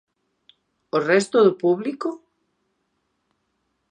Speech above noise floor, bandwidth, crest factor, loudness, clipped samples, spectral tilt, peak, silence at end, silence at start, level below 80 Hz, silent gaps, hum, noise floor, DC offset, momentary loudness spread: 53 dB; 10 kHz; 20 dB; -21 LUFS; under 0.1%; -5.5 dB/octave; -4 dBFS; 1.75 s; 0.95 s; -78 dBFS; none; none; -73 dBFS; under 0.1%; 13 LU